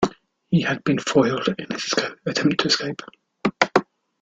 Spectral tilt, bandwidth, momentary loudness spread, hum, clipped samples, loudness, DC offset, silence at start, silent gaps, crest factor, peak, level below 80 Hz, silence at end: -4.5 dB/octave; 9.2 kHz; 8 LU; none; under 0.1%; -22 LUFS; under 0.1%; 0 s; none; 22 dB; -2 dBFS; -58 dBFS; 0.4 s